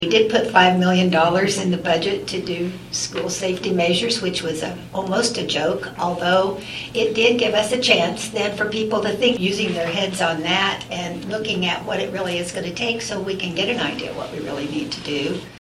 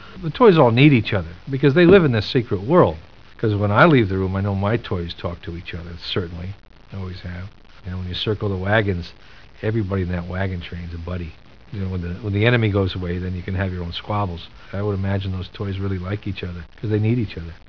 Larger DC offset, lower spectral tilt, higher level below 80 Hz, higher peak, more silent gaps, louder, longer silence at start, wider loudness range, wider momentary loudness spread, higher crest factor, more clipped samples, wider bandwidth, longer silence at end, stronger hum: second, under 0.1% vs 0.7%; second, -4 dB/octave vs -9 dB/octave; second, -52 dBFS vs -42 dBFS; about the same, 0 dBFS vs 0 dBFS; neither; about the same, -20 LUFS vs -20 LUFS; about the same, 0 s vs 0 s; second, 4 LU vs 10 LU; second, 10 LU vs 19 LU; about the same, 20 dB vs 20 dB; neither; first, 13.5 kHz vs 5.4 kHz; second, 0 s vs 0.15 s; neither